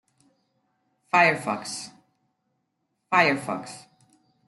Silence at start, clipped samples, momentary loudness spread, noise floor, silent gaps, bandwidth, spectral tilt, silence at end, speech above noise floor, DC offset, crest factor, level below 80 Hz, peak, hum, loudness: 1.15 s; under 0.1%; 22 LU; -77 dBFS; none; 12 kHz; -4 dB/octave; 0.65 s; 53 dB; under 0.1%; 22 dB; -76 dBFS; -6 dBFS; none; -23 LUFS